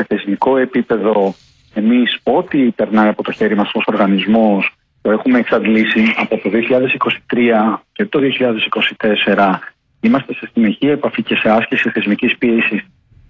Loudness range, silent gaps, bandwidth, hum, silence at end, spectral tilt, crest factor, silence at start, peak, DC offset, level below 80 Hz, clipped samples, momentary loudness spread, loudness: 1 LU; none; 5.6 kHz; none; 0.45 s; -7.5 dB/octave; 12 dB; 0 s; -2 dBFS; under 0.1%; -54 dBFS; under 0.1%; 5 LU; -14 LUFS